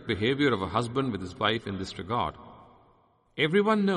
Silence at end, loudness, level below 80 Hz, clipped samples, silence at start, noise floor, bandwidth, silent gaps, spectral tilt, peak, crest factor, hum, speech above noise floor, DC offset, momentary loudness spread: 0 s; -28 LUFS; -58 dBFS; under 0.1%; 0 s; -64 dBFS; 10.5 kHz; none; -6 dB/octave; -10 dBFS; 18 dB; none; 37 dB; under 0.1%; 11 LU